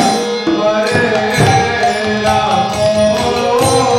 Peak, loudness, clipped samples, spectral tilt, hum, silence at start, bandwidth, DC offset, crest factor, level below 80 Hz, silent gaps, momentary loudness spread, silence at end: 0 dBFS; -13 LUFS; under 0.1%; -4.5 dB/octave; none; 0 s; 16.5 kHz; under 0.1%; 12 dB; -38 dBFS; none; 3 LU; 0 s